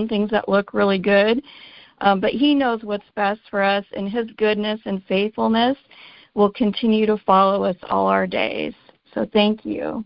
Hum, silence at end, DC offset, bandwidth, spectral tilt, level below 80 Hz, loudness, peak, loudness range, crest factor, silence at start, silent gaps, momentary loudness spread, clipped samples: none; 0 s; under 0.1%; 5.6 kHz; -10.5 dB/octave; -56 dBFS; -20 LUFS; -2 dBFS; 2 LU; 18 dB; 0 s; none; 10 LU; under 0.1%